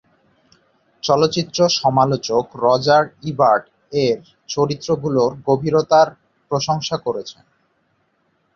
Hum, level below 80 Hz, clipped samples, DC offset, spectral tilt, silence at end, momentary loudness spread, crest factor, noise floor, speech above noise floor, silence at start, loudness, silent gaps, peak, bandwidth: none; -56 dBFS; under 0.1%; under 0.1%; -5 dB/octave; 1.25 s; 10 LU; 18 dB; -65 dBFS; 47 dB; 1.05 s; -18 LUFS; none; -2 dBFS; 7.4 kHz